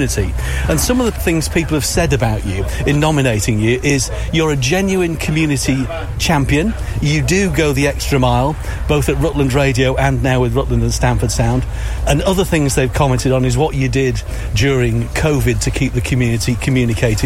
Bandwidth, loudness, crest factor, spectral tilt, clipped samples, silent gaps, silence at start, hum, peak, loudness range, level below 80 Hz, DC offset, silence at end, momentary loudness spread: 16.5 kHz; -15 LUFS; 14 dB; -5.5 dB/octave; under 0.1%; none; 0 s; none; 0 dBFS; 1 LU; -24 dBFS; under 0.1%; 0 s; 5 LU